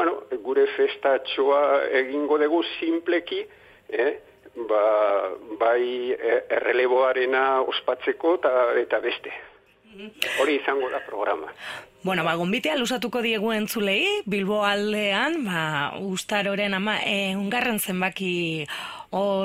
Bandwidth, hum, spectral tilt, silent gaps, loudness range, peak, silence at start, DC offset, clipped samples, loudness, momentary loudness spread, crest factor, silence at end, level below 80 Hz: 16 kHz; none; -4.5 dB/octave; none; 3 LU; -4 dBFS; 0 s; under 0.1%; under 0.1%; -24 LUFS; 10 LU; 20 dB; 0 s; -66 dBFS